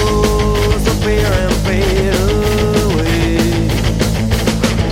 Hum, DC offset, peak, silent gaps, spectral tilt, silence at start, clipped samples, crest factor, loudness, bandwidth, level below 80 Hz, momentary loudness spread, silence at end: none; under 0.1%; -2 dBFS; none; -5.5 dB/octave; 0 s; under 0.1%; 10 dB; -14 LUFS; 17 kHz; -20 dBFS; 1 LU; 0 s